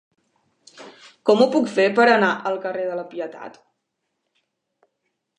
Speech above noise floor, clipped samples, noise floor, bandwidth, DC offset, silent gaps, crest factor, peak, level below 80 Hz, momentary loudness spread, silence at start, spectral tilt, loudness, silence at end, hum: 58 dB; under 0.1%; -77 dBFS; 10.5 kHz; under 0.1%; none; 20 dB; -2 dBFS; -78 dBFS; 17 LU; 0.8 s; -5 dB/octave; -19 LUFS; 1.9 s; none